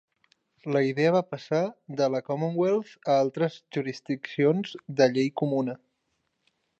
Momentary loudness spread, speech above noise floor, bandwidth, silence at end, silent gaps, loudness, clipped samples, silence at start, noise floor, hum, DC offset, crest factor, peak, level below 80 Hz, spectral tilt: 9 LU; 51 dB; 8.2 kHz; 1.05 s; none; -27 LUFS; under 0.1%; 0.65 s; -77 dBFS; none; under 0.1%; 18 dB; -8 dBFS; -78 dBFS; -6.5 dB/octave